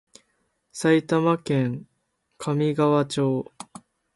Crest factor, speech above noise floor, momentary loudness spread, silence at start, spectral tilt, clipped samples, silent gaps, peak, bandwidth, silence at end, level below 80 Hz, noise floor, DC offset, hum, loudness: 18 dB; 51 dB; 19 LU; 0.75 s; -6.5 dB/octave; under 0.1%; none; -8 dBFS; 11.5 kHz; 0.5 s; -66 dBFS; -73 dBFS; under 0.1%; none; -23 LUFS